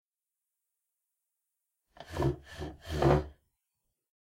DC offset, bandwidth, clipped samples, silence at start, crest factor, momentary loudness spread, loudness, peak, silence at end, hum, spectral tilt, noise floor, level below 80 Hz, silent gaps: under 0.1%; 15.5 kHz; under 0.1%; 2 s; 24 dB; 16 LU; -31 LUFS; -12 dBFS; 1.05 s; none; -7.5 dB/octave; under -90 dBFS; -48 dBFS; none